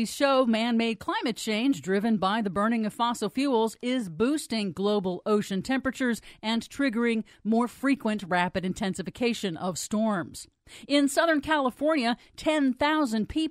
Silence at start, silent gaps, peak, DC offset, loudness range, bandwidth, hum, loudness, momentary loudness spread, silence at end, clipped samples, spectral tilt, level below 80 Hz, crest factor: 0 s; none; -10 dBFS; under 0.1%; 2 LU; 15.5 kHz; none; -27 LUFS; 6 LU; 0 s; under 0.1%; -4.5 dB/octave; -58 dBFS; 16 dB